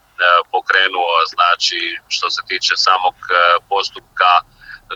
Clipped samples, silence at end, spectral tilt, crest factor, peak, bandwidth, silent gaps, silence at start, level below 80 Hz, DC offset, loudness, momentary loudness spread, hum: under 0.1%; 0 s; 0.5 dB/octave; 16 dB; 0 dBFS; 10 kHz; none; 0.2 s; -58 dBFS; under 0.1%; -14 LUFS; 7 LU; none